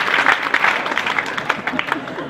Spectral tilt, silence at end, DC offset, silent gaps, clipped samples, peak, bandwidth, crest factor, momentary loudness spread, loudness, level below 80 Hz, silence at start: -3 dB/octave; 0 s; under 0.1%; none; under 0.1%; 0 dBFS; 16 kHz; 20 dB; 7 LU; -18 LUFS; -60 dBFS; 0 s